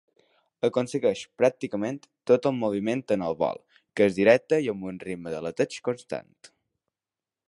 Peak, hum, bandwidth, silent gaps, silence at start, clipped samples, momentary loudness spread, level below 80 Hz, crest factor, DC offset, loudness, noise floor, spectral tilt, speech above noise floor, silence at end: -6 dBFS; none; 11.5 kHz; none; 0.65 s; under 0.1%; 14 LU; -66 dBFS; 22 dB; under 0.1%; -26 LUFS; under -90 dBFS; -6 dB/octave; over 64 dB; 1.25 s